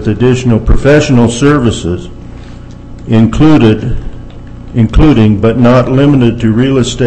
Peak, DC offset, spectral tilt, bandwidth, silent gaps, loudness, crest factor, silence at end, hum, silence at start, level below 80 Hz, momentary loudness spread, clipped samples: 0 dBFS; under 0.1%; -7 dB/octave; 8.8 kHz; none; -8 LUFS; 8 dB; 0 s; 60 Hz at -30 dBFS; 0 s; -20 dBFS; 22 LU; 3%